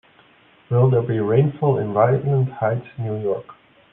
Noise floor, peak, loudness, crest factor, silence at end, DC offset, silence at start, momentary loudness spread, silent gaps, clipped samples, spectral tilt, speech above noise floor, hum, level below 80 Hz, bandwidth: -53 dBFS; -4 dBFS; -20 LUFS; 18 dB; 0.4 s; under 0.1%; 0.7 s; 9 LU; none; under 0.1%; -12 dB/octave; 34 dB; none; -58 dBFS; 3.7 kHz